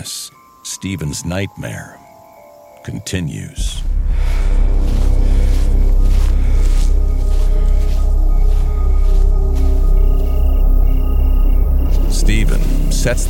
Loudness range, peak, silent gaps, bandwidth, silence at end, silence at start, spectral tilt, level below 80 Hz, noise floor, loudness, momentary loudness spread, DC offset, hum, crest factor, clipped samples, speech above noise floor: 7 LU; -2 dBFS; none; 12 kHz; 0 s; 0 s; -5.5 dB/octave; -12 dBFS; -41 dBFS; -18 LUFS; 8 LU; under 0.1%; none; 10 dB; under 0.1%; 24 dB